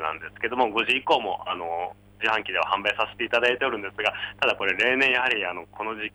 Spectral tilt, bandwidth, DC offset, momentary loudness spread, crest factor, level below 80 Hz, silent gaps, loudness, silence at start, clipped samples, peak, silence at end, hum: -3.5 dB/octave; over 20 kHz; under 0.1%; 11 LU; 16 dB; -60 dBFS; none; -24 LUFS; 0 s; under 0.1%; -10 dBFS; 0.05 s; 50 Hz at -55 dBFS